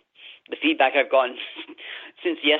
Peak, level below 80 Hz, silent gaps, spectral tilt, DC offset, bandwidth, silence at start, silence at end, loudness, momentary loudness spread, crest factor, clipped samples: -6 dBFS; -82 dBFS; none; 2 dB/octave; under 0.1%; 4.5 kHz; 0.25 s; 0 s; -22 LUFS; 18 LU; 18 dB; under 0.1%